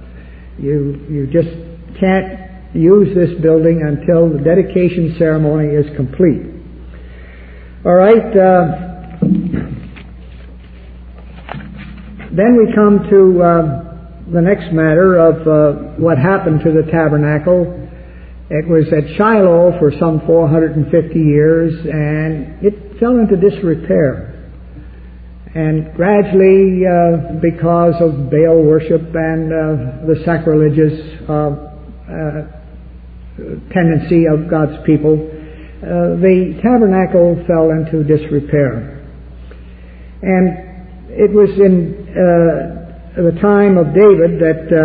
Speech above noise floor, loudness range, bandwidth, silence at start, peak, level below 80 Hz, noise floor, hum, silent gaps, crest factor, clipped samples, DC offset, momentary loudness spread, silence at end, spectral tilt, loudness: 22 dB; 5 LU; 4.7 kHz; 0 s; 0 dBFS; -34 dBFS; -33 dBFS; none; none; 12 dB; under 0.1%; under 0.1%; 18 LU; 0 s; -12.5 dB/octave; -12 LUFS